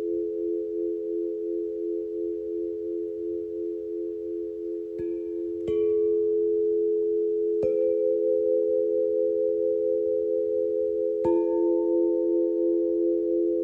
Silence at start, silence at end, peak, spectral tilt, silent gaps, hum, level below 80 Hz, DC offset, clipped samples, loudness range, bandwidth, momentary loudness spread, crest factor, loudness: 0 s; 0 s; -14 dBFS; -10 dB/octave; none; none; -62 dBFS; under 0.1%; under 0.1%; 7 LU; 3.2 kHz; 8 LU; 12 dB; -26 LUFS